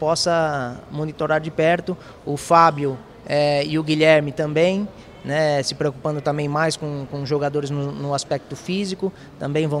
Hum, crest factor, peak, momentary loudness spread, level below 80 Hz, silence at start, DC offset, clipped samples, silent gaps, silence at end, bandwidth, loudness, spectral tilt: none; 20 dB; 0 dBFS; 13 LU; -54 dBFS; 0 s; under 0.1%; under 0.1%; none; 0 s; 13.5 kHz; -21 LUFS; -5 dB/octave